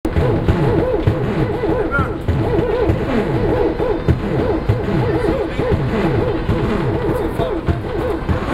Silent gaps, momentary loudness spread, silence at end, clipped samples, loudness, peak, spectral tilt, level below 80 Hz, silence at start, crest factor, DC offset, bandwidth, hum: none; 3 LU; 0 s; under 0.1%; -18 LUFS; 0 dBFS; -8.5 dB/octave; -26 dBFS; 0.05 s; 16 dB; under 0.1%; 14 kHz; none